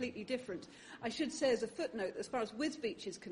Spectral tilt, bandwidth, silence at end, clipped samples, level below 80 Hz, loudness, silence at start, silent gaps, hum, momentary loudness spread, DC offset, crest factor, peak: -3.5 dB/octave; 10.5 kHz; 0 s; under 0.1%; -72 dBFS; -39 LUFS; 0 s; none; none; 11 LU; under 0.1%; 16 dB; -22 dBFS